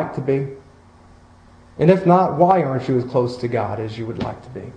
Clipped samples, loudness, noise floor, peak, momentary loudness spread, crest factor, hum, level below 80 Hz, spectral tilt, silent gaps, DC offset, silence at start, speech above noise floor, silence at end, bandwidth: under 0.1%; -19 LUFS; -47 dBFS; 0 dBFS; 14 LU; 18 dB; none; -50 dBFS; -9 dB/octave; none; under 0.1%; 0 s; 29 dB; 0 s; 9.2 kHz